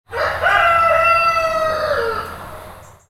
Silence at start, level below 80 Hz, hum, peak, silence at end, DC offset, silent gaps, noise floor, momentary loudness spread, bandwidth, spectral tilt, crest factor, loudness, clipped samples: 0.1 s; -42 dBFS; none; -2 dBFS; 0.25 s; under 0.1%; none; -38 dBFS; 19 LU; 16 kHz; -3.5 dB/octave; 16 dB; -15 LUFS; under 0.1%